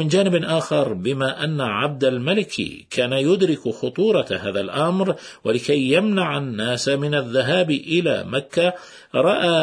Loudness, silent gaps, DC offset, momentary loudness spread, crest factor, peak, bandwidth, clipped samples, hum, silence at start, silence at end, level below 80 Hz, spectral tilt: -21 LUFS; none; under 0.1%; 6 LU; 16 dB; -4 dBFS; 10.5 kHz; under 0.1%; none; 0 s; 0 s; -60 dBFS; -5.5 dB/octave